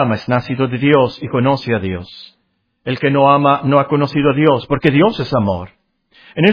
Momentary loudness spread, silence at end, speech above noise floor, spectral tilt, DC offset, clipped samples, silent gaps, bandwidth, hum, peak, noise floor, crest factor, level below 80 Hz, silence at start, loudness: 12 LU; 0 s; 51 dB; -8.5 dB/octave; under 0.1%; under 0.1%; none; 5.4 kHz; none; 0 dBFS; -66 dBFS; 14 dB; -46 dBFS; 0 s; -15 LUFS